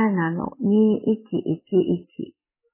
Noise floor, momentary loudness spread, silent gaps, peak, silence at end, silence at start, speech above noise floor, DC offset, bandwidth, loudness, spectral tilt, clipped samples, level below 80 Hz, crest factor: -42 dBFS; 16 LU; none; -8 dBFS; 0.45 s; 0 s; 21 dB; under 0.1%; 3.2 kHz; -22 LUFS; -12 dB/octave; under 0.1%; -60 dBFS; 14 dB